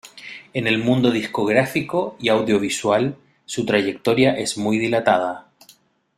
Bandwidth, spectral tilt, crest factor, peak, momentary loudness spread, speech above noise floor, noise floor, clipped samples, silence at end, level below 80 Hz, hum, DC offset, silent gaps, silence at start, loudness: 15 kHz; -5 dB/octave; 18 dB; -2 dBFS; 10 LU; 35 dB; -54 dBFS; under 0.1%; 0.75 s; -58 dBFS; none; under 0.1%; none; 0.05 s; -20 LUFS